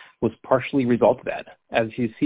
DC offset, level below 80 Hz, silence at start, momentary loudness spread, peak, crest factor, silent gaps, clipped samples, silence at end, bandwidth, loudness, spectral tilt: under 0.1%; -54 dBFS; 0 s; 9 LU; -4 dBFS; 18 dB; none; under 0.1%; 0 s; 4 kHz; -23 LUFS; -11 dB/octave